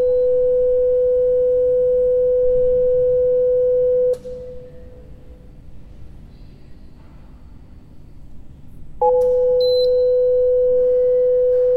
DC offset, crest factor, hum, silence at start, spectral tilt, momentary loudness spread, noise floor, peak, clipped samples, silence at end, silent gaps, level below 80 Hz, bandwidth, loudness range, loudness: under 0.1%; 12 dB; none; 0 s; -7 dB/octave; 3 LU; -40 dBFS; -6 dBFS; under 0.1%; 0 s; none; -40 dBFS; 4.3 kHz; 9 LU; -17 LUFS